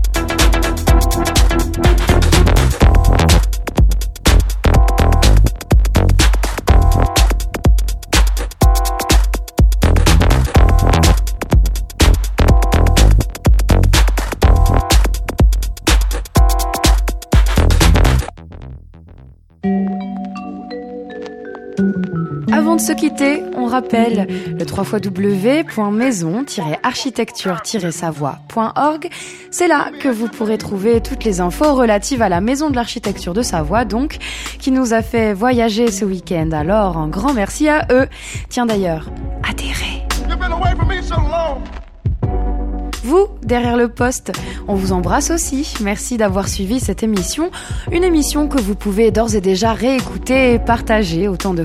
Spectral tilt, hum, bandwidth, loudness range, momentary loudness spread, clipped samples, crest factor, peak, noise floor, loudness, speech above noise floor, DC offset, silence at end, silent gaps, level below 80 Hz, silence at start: -5.5 dB/octave; none; 15.5 kHz; 6 LU; 9 LU; under 0.1%; 14 dB; 0 dBFS; -41 dBFS; -16 LUFS; 25 dB; under 0.1%; 0 s; none; -18 dBFS; 0 s